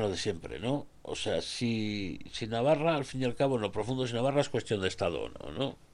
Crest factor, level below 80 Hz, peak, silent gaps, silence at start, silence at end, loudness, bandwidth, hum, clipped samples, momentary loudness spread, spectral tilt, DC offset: 18 dB; -56 dBFS; -14 dBFS; none; 0 s; 0.2 s; -32 LUFS; 12 kHz; none; under 0.1%; 9 LU; -5.5 dB/octave; under 0.1%